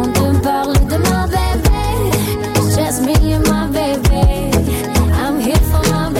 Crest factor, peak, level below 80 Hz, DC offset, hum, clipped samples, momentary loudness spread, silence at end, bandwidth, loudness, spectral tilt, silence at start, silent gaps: 12 dB; -2 dBFS; -18 dBFS; under 0.1%; none; under 0.1%; 3 LU; 0 s; 17 kHz; -15 LUFS; -5.5 dB/octave; 0 s; none